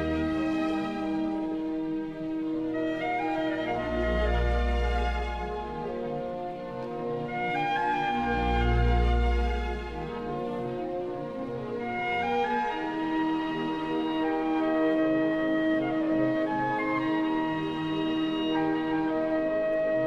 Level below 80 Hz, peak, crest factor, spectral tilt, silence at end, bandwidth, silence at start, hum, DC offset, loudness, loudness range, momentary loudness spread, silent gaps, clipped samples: -36 dBFS; -14 dBFS; 14 dB; -7.5 dB/octave; 0 s; 7.6 kHz; 0 s; none; under 0.1%; -29 LUFS; 4 LU; 8 LU; none; under 0.1%